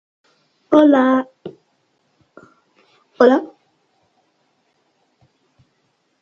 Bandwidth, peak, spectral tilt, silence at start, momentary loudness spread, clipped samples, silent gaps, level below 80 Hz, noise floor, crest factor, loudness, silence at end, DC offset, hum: 7 kHz; 0 dBFS; -6 dB/octave; 0.7 s; 26 LU; under 0.1%; none; -70 dBFS; -66 dBFS; 20 dB; -14 LUFS; 2.75 s; under 0.1%; none